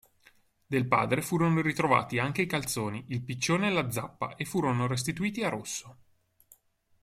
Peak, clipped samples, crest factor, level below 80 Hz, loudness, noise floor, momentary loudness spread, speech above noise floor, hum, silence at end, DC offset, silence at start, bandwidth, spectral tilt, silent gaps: -8 dBFS; under 0.1%; 22 dB; -62 dBFS; -29 LUFS; -66 dBFS; 9 LU; 36 dB; none; 1.1 s; under 0.1%; 0.7 s; 16 kHz; -5 dB/octave; none